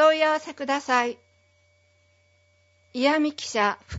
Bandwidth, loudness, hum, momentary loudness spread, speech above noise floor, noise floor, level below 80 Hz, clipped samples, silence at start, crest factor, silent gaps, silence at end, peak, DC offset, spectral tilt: 8 kHz; -24 LUFS; none; 8 LU; 38 dB; -63 dBFS; -70 dBFS; under 0.1%; 0 s; 18 dB; none; 0 s; -8 dBFS; under 0.1%; -3.5 dB/octave